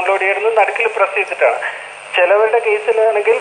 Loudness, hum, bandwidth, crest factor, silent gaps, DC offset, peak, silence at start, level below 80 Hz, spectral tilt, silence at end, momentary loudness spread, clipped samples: -14 LUFS; none; 10 kHz; 14 dB; none; under 0.1%; 0 dBFS; 0 s; -72 dBFS; -1.5 dB/octave; 0 s; 7 LU; under 0.1%